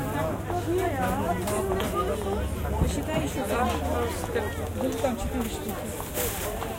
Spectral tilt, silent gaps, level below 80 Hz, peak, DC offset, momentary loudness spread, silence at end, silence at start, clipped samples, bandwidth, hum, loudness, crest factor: -5.5 dB/octave; none; -36 dBFS; -10 dBFS; under 0.1%; 4 LU; 0 s; 0 s; under 0.1%; 16.5 kHz; none; -28 LUFS; 18 dB